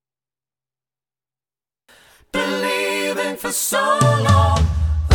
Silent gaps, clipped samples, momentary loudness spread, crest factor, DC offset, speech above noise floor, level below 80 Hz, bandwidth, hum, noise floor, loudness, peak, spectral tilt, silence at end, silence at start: none; under 0.1%; 8 LU; 18 dB; under 0.1%; over 74 dB; -30 dBFS; 18 kHz; none; under -90 dBFS; -18 LUFS; -2 dBFS; -4.5 dB/octave; 0 s; 2.35 s